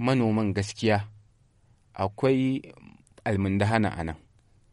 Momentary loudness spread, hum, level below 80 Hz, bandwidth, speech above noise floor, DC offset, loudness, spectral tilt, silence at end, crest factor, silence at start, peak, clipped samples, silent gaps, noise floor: 12 LU; none; -54 dBFS; 11.5 kHz; 36 dB; under 0.1%; -27 LUFS; -7 dB/octave; 0.55 s; 20 dB; 0 s; -8 dBFS; under 0.1%; none; -62 dBFS